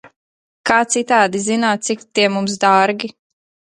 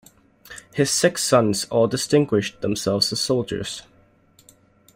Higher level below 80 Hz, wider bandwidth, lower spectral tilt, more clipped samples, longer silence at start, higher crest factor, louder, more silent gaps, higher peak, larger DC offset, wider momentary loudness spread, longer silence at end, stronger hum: second, -62 dBFS vs -56 dBFS; second, 11.5 kHz vs 16 kHz; about the same, -3 dB/octave vs -4 dB/octave; neither; second, 0.05 s vs 0.5 s; about the same, 16 dB vs 18 dB; first, -16 LUFS vs -21 LUFS; first, 0.16-0.64 s vs none; first, 0 dBFS vs -4 dBFS; neither; second, 8 LU vs 14 LU; second, 0.65 s vs 1.15 s; neither